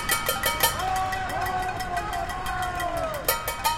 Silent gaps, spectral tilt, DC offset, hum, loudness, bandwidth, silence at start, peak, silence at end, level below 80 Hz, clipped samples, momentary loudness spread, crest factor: none; -2 dB/octave; under 0.1%; none; -26 LUFS; 17 kHz; 0 s; -6 dBFS; 0 s; -40 dBFS; under 0.1%; 7 LU; 22 dB